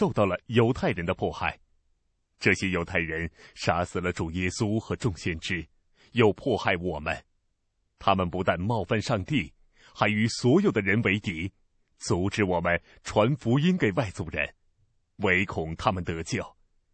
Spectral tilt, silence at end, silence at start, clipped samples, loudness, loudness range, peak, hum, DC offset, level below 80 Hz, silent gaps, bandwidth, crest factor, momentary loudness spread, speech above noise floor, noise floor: -6 dB/octave; 0.45 s; 0 s; under 0.1%; -27 LUFS; 3 LU; -6 dBFS; none; under 0.1%; -50 dBFS; none; 8.8 kHz; 20 dB; 9 LU; 48 dB; -74 dBFS